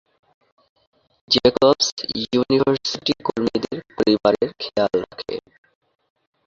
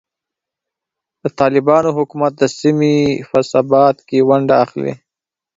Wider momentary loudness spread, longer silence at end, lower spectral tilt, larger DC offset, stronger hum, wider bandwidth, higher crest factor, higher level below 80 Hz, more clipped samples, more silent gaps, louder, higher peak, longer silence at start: first, 13 LU vs 8 LU; first, 1.05 s vs 0.6 s; second, -4.5 dB/octave vs -6.5 dB/octave; neither; neither; about the same, 7.6 kHz vs 7.8 kHz; about the same, 20 dB vs 16 dB; about the same, -54 dBFS vs -54 dBFS; neither; first, 1.92-1.97 s vs none; second, -20 LUFS vs -14 LUFS; about the same, -2 dBFS vs 0 dBFS; about the same, 1.3 s vs 1.25 s